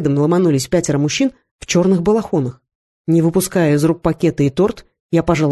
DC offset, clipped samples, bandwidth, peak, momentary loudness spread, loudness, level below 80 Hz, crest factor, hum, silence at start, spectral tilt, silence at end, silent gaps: under 0.1%; under 0.1%; 12.5 kHz; -2 dBFS; 6 LU; -16 LUFS; -42 dBFS; 14 dB; none; 0 s; -6 dB/octave; 0 s; 1.51-1.59 s, 2.75-3.05 s, 5.00-5.09 s